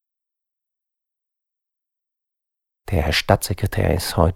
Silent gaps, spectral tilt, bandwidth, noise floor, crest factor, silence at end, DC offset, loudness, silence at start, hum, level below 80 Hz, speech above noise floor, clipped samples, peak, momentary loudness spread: none; -5 dB/octave; 17 kHz; -82 dBFS; 24 dB; 0 s; under 0.1%; -20 LUFS; 2.9 s; none; -36 dBFS; 63 dB; under 0.1%; 0 dBFS; 6 LU